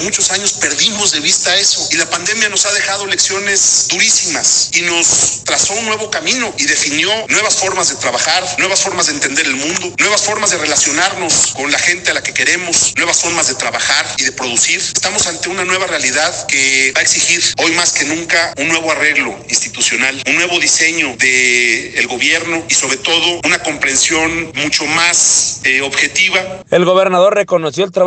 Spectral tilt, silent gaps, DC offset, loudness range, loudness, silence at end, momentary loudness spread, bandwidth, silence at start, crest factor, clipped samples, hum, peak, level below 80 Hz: -0.5 dB/octave; none; under 0.1%; 2 LU; -11 LUFS; 0 s; 5 LU; 9.8 kHz; 0 s; 14 dB; under 0.1%; none; 0 dBFS; -50 dBFS